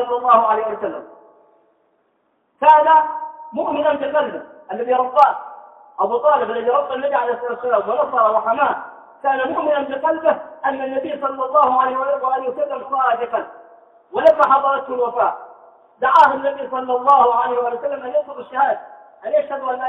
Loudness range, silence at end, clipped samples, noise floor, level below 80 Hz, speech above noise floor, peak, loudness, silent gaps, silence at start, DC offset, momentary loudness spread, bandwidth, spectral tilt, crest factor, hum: 3 LU; 0 s; under 0.1%; -65 dBFS; -66 dBFS; 48 dB; 0 dBFS; -18 LUFS; none; 0 s; under 0.1%; 14 LU; 6 kHz; -5.5 dB/octave; 18 dB; none